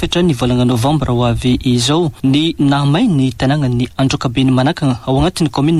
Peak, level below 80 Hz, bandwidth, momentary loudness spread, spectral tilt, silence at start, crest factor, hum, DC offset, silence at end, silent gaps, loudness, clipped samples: -4 dBFS; -32 dBFS; 13 kHz; 3 LU; -6 dB/octave; 0 s; 10 dB; none; under 0.1%; 0 s; none; -14 LUFS; under 0.1%